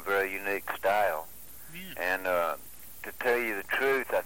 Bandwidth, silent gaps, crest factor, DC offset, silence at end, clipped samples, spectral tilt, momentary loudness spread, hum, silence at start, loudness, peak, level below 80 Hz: 17 kHz; none; 18 dB; 0.5%; 0 s; under 0.1%; -3 dB/octave; 16 LU; none; 0 s; -29 LUFS; -14 dBFS; -62 dBFS